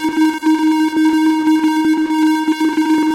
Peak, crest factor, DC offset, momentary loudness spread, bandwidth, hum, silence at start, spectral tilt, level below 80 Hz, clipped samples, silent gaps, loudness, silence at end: -8 dBFS; 6 dB; under 0.1%; 2 LU; 15.5 kHz; none; 0 s; -3.5 dB/octave; -60 dBFS; under 0.1%; none; -14 LUFS; 0 s